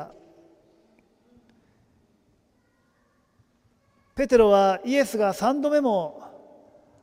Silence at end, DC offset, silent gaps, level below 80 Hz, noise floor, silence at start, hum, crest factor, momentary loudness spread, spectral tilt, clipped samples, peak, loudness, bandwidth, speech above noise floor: 0.75 s; under 0.1%; none; -54 dBFS; -66 dBFS; 0 s; none; 20 dB; 20 LU; -5 dB/octave; under 0.1%; -6 dBFS; -22 LUFS; 16 kHz; 45 dB